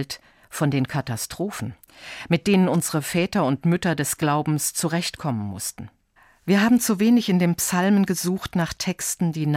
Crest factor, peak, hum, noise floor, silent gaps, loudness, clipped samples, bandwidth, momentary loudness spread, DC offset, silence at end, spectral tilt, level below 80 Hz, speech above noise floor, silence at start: 16 dB; -6 dBFS; none; -58 dBFS; none; -22 LUFS; under 0.1%; 16.5 kHz; 15 LU; under 0.1%; 0 s; -5 dB/octave; -54 dBFS; 35 dB; 0 s